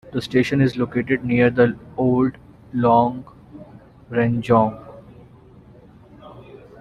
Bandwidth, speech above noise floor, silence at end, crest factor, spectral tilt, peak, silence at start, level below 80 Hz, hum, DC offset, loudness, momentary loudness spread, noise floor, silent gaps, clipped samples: 10.5 kHz; 28 dB; 0.4 s; 18 dB; -8 dB/octave; -2 dBFS; 0.05 s; -52 dBFS; none; under 0.1%; -19 LUFS; 8 LU; -47 dBFS; none; under 0.1%